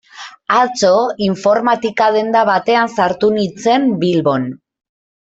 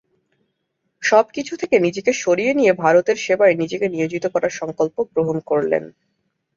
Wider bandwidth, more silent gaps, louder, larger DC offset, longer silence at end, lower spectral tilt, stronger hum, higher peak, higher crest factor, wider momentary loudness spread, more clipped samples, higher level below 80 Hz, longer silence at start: about the same, 8 kHz vs 7.6 kHz; neither; first, -14 LUFS vs -19 LUFS; neither; about the same, 0.75 s vs 0.65 s; about the same, -5 dB/octave vs -5 dB/octave; neither; about the same, -2 dBFS vs -2 dBFS; about the same, 14 dB vs 18 dB; second, 4 LU vs 7 LU; neither; about the same, -58 dBFS vs -62 dBFS; second, 0.15 s vs 1 s